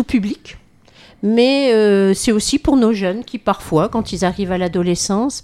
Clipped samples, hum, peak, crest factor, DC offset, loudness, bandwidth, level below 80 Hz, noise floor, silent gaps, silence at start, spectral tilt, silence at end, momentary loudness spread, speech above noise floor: under 0.1%; none; -2 dBFS; 14 dB; under 0.1%; -16 LUFS; 14.5 kHz; -40 dBFS; -46 dBFS; none; 0 s; -5 dB/octave; 0.05 s; 8 LU; 30 dB